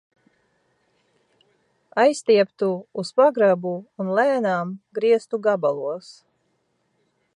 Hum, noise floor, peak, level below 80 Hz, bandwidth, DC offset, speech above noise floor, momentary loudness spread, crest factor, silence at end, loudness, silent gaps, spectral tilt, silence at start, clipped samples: none; -70 dBFS; -6 dBFS; -80 dBFS; 11 kHz; under 0.1%; 49 dB; 12 LU; 18 dB; 1.25 s; -21 LUFS; none; -5.5 dB/octave; 1.95 s; under 0.1%